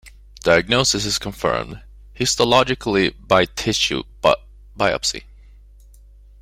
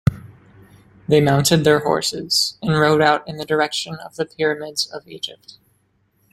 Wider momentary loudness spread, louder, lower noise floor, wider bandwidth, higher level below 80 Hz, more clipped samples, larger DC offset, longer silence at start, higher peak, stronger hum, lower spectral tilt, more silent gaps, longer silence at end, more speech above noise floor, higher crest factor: second, 9 LU vs 15 LU; about the same, -19 LUFS vs -18 LUFS; second, -45 dBFS vs -63 dBFS; about the same, 16 kHz vs 16.5 kHz; first, -42 dBFS vs -50 dBFS; neither; neither; about the same, 0.05 s vs 0.05 s; about the same, -2 dBFS vs -2 dBFS; neither; second, -3 dB/octave vs -4.5 dB/octave; neither; first, 1.2 s vs 1 s; second, 26 dB vs 45 dB; about the same, 20 dB vs 18 dB